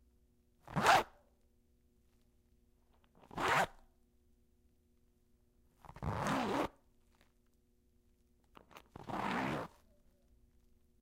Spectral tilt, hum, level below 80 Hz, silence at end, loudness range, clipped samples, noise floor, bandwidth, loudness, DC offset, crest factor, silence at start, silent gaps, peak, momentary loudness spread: -4 dB/octave; none; -62 dBFS; 1.35 s; 7 LU; under 0.1%; -73 dBFS; 16 kHz; -36 LUFS; under 0.1%; 28 dB; 0.65 s; none; -12 dBFS; 20 LU